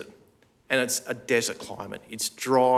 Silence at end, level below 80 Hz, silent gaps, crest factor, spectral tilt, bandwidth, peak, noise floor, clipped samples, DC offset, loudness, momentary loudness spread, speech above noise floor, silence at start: 0 s; -70 dBFS; none; 20 dB; -2.5 dB/octave; 16.5 kHz; -6 dBFS; -60 dBFS; under 0.1%; under 0.1%; -27 LUFS; 13 LU; 35 dB; 0 s